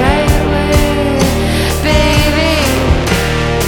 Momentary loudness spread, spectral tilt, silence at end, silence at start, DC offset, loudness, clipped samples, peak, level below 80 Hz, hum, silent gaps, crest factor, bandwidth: 3 LU; -5 dB/octave; 0 s; 0 s; under 0.1%; -12 LUFS; under 0.1%; 0 dBFS; -18 dBFS; none; none; 10 dB; 19.5 kHz